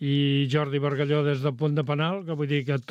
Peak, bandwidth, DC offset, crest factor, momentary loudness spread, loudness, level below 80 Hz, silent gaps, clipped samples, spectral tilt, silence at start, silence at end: -12 dBFS; 7.6 kHz; under 0.1%; 14 dB; 4 LU; -25 LUFS; -68 dBFS; none; under 0.1%; -8 dB/octave; 0 s; 0.1 s